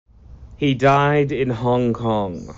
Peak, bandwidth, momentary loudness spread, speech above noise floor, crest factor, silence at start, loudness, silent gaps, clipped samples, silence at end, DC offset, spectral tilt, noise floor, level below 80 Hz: -4 dBFS; 7.8 kHz; 7 LU; 23 dB; 16 dB; 0.3 s; -19 LUFS; none; under 0.1%; 0 s; under 0.1%; -5.5 dB/octave; -42 dBFS; -44 dBFS